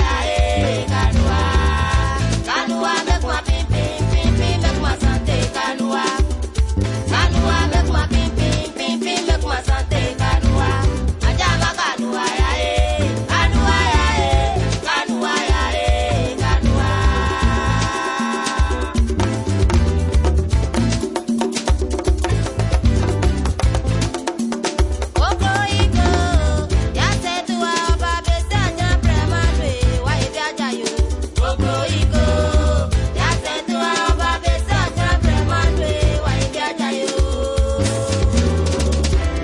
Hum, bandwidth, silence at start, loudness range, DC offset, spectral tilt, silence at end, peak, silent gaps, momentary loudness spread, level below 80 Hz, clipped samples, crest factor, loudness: none; 11.5 kHz; 0 s; 2 LU; under 0.1%; -5 dB/octave; 0 s; -2 dBFS; none; 4 LU; -22 dBFS; under 0.1%; 14 dB; -18 LUFS